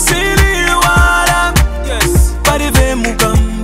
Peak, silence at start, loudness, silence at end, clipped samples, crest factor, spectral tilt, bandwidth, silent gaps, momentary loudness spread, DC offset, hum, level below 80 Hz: 0 dBFS; 0 s; -11 LUFS; 0 s; under 0.1%; 10 dB; -4 dB/octave; 16.5 kHz; none; 5 LU; under 0.1%; none; -14 dBFS